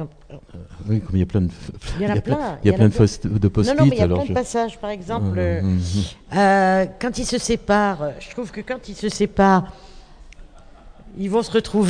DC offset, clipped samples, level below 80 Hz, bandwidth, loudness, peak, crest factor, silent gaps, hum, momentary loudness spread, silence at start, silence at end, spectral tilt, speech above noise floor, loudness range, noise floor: under 0.1%; under 0.1%; -38 dBFS; 10 kHz; -20 LUFS; 0 dBFS; 20 dB; none; none; 15 LU; 0 s; 0 s; -6.5 dB/octave; 24 dB; 4 LU; -43 dBFS